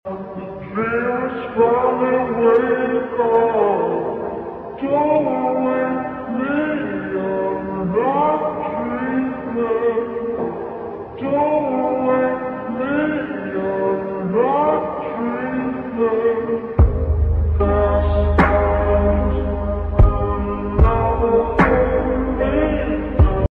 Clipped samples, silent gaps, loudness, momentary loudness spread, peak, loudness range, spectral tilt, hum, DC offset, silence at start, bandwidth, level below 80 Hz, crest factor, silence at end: under 0.1%; none; -19 LUFS; 9 LU; -2 dBFS; 3 LU; -10 dB/octave; none; under 0.1%; 0.05 s; 4.4 kHz; -26 dBFS; 16 dB; 0.05 s